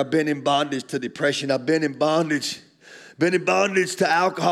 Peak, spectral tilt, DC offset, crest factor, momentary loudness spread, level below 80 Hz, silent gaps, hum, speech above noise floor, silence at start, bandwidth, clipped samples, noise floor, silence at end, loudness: -6 dBFS; -4.5 dB/octave; under 0.1%; 16 dB; 7 LU; -76 dBFS; none; none; 25 dB; 0 s; 14.5 kHz; under 0.1%; -47 dBFS; 0 s; -22 LUFS